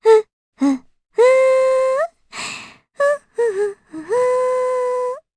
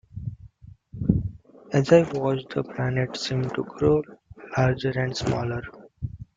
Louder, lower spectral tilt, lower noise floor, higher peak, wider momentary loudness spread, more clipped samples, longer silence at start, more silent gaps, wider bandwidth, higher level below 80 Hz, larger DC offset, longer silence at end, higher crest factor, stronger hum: first, -18 LUFS vs -25 LUFS; second, -3.5 dB/octave vs -7 dB/octave; second, -36 dBFS vs -48 dBFS; about the same, -2 dBFS vs -4 dBFS; second, 14 LU vs 18 LU; neither; about the same, 0.05 s vs 0.15 s; first, 0.33-0.52 s vs none; first, 11 kHz vs 7.8 kHz; second, -66 dBFS vs -46 dBFS; neither; about the same, 0.2 s vs 0.15 s; second, 16 dB vs 22 dB; neither